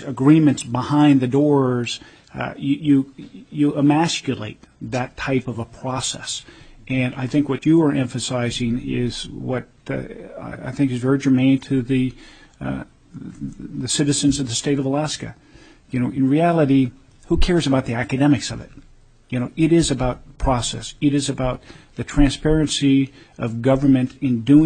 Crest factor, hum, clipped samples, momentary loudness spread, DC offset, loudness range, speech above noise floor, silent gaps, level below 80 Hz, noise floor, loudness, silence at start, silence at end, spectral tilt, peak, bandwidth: 18 dB; none; under 0.1%; 15 LU; under 0.1%; 3 LU; 30 dB; none; -34 dBFS; -49 dBFS; -20 LUFS; 0 s; 0 s; -5.5 dB/octave; -2 dBFS; 9.4 kHz